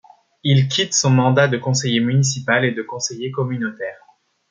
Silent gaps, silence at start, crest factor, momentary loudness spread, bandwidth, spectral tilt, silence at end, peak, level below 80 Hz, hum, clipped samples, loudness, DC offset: none; 0.45 s; 18 dB; 10 LU; 9.4 kHz; -4.5 dB/octave; 0.55 s; -2 dBFS; -60 dBFS; none; under 0.1%; -18 LUFS; under 0.1%